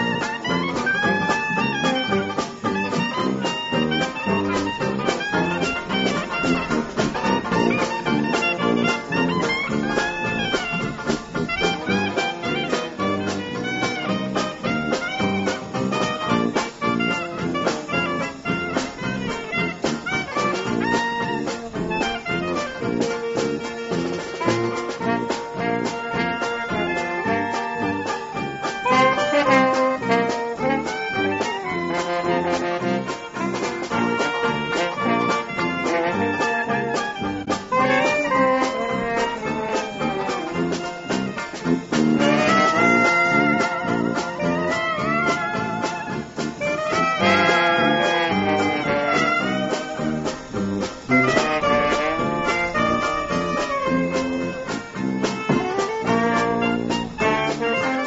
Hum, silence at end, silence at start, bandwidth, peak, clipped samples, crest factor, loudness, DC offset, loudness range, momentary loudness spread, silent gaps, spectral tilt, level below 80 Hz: none; 0 s; 0 s; 8 kHz; -2 dBFS; under 0.1%; 20 dB; -22 LUFS; under 0.1%; 5 LU; 8 LU; none; -3.5 dB/octave; -50 dBFS